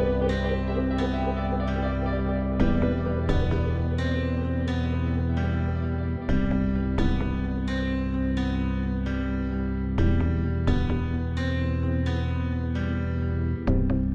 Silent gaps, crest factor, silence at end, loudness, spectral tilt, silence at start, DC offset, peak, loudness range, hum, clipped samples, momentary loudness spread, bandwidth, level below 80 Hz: none; 16 dB; 0 s; -27 LUFS; -8.5 dB/octave; 0 s; under 0.1%; -10 dBFS; 1 LU; none; under 0.1%; 3 LU; 7.4 kHz; -30 dBFS